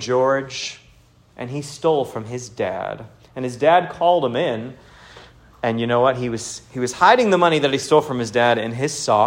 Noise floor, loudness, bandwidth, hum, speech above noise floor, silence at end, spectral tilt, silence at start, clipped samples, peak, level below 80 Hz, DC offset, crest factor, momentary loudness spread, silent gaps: -52 dBFS; -20 LUFS; 16 kHz; none; 33 dB; 0 s; -4.5 dB/octave; 0 s; under 0.1%; 0 dBFS; -56 dBFS; under 0.1%; 20 dB; 14 LU; none